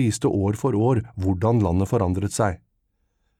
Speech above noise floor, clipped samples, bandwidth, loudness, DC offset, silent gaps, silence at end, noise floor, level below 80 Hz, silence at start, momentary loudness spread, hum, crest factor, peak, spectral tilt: 49 dB; under 0.1%; 14 kHz; -22 LUFS; under 0.1%; none; 0.85 s; -71 dBFS; -46 dBFS; 0 s; 4 LU; none; 14 dB; -8 dBFS; -7 dB/octave